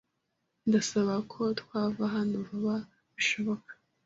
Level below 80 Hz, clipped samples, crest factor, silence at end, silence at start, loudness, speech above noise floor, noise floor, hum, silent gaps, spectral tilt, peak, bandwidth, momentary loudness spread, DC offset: -70 dBFS; under 0.1%; 18 dB; 0.35 s; 0.65 s; -31 LUFS; 50 dB; -80 dBFS; none; none; -4.5 dB/octave; -14 dBFS; 8 kHz; 8 LU; under 0.1%